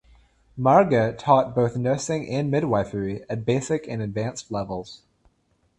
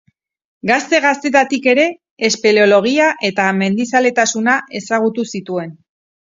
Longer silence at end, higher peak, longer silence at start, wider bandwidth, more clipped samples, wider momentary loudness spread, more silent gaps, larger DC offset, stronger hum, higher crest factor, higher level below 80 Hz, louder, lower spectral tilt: first, 0.8 s vs 0.55 s; second, -4 dBFS vs 0 dBFS; about the same, 0.55 s vs 0.65 s; first, 11.5 kHz vs 7.8 kHz; neither; about the same, 12 LU vs 11 LU; second, none vs 2.11-2.17 s; neither; neither; about the same, 20 dB vs 16 dB; first, -54 dBFS vs -64 dBFS; second, -23 LUFS vs -15 LUFS; first, -6.5 dB/octave vs -3.5 dB/octave